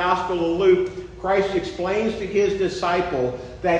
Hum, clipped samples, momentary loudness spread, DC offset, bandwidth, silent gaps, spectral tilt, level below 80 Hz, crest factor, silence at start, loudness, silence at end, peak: none; under 0.1%; 8 LU; under 0.1%; 8.6 kHz; none; -6 dB/octave; -44 dBFS; 16 dB; 0 s; -22 LUFS; 0 s; -6 dBFS